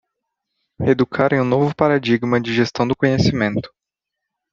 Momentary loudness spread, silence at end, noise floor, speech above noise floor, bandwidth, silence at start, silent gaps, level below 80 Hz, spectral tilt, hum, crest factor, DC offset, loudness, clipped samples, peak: 4 LU; 0.85 s; -82 dBFS; 65 dB; 7.4 kHz; 0.8 s; none; -52 dBFS; -7 dB/octave; none; 18 dB; under 0.1%; -18 LUFS; under 0.1%; 0 dBFS